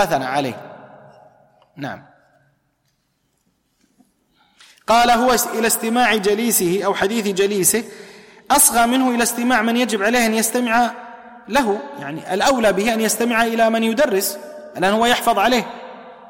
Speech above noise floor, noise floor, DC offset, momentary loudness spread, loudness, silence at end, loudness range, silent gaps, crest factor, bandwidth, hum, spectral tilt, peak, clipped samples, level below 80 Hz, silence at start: 50 dB; -67 dBFS; under 0.1%; 17 LU; -17 LUFS; 0.05 s; 4 LU; none; 18 dB; 16.5 kHz; none; -2.5 dB/octave; -2 dBFS; under 0.1%; -50 dBFS; 0 s